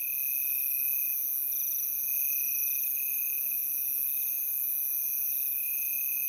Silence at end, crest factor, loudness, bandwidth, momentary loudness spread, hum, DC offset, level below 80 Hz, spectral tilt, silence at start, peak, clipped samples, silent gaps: 0 s; 14 dB; -27 LUFS; 17 kHz; 2 LU; none; under 0.1%; -76 dBFS; 2 dB/octave; 0 s; -16 dBFS; under 0.1%; none